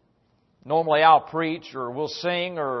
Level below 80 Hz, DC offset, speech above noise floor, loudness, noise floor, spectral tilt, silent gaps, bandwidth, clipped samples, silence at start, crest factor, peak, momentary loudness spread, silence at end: -70 dBFS; under 0.1%; 43 dB; -23 LUFS; -65 dBFS; -5.5 dB/octave; none; 6.2 kHz; under 0.1%; 0.65 s; 20 dB; -4 dBFS; 13 LU; 0 s